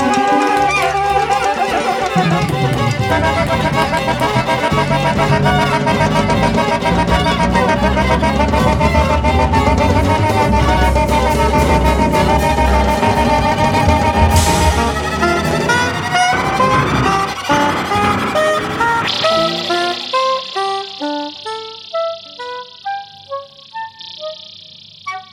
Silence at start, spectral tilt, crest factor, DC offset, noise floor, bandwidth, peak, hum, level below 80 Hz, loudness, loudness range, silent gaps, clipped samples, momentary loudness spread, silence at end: 0 s; -5 dB/octave; 14 dB; under 0.1%; -38 dBFS; 17 kHz; 0 dBFS; none; -24 dBFS; -14 LUFS; 8 LU; none; under 0.1%; 14 LU; 0.05 s